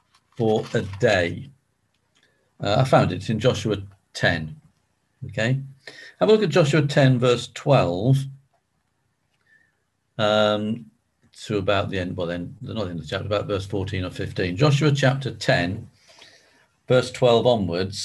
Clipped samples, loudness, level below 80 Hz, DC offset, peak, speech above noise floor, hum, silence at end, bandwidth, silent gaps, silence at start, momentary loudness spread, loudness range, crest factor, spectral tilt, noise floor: under 0.1%; -22 LUFS; -48 dBFS; under 0.1%; -2 dBFS; 50 dB; none; 0 s; 12 kHz; none; 0.4 s; 14 LU; 6 LU; 20 dB; -6 dB/octave; -71 dBFS